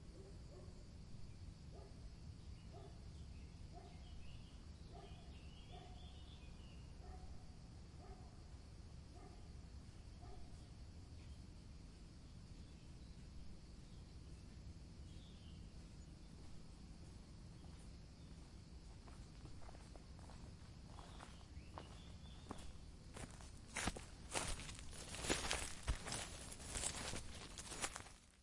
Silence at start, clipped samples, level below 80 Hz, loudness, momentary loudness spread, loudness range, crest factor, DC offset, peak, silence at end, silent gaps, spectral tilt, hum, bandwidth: 0 s; under 0.1%; -58 dBFS; -53 LUFS; 14 LU; 13 LU; 34 dB; under 0.1%; -20 dBFS; 0 s; none; -3 dB/octave; none; 11.5 kHz